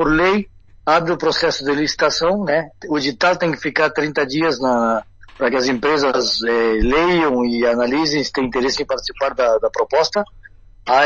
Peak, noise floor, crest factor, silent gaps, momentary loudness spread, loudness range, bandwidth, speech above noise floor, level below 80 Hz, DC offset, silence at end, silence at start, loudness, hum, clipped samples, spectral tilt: 0 dBFS; -43 dBFS; 16 dB; none; 6 LU; 2 LU; 7.8 kHz; 26 dB; -36 dBFS; 0.3%; 0 s; 0 s; -18 LUFS; none; under 0.1%; -4 dB/octave